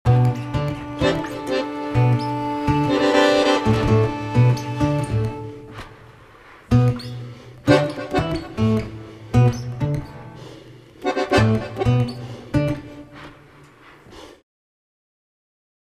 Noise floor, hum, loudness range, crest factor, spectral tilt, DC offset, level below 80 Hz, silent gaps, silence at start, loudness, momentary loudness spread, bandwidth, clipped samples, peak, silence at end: -47 dBFS; none; 6 LU; 20 dB; -7 dB/octave; under 0.1%; -40 dBFS; none; 0.05 s; -20 LUFS; 20 LU; 11.5 kHz; under 0.1%; 0 dBFS; 1.6 s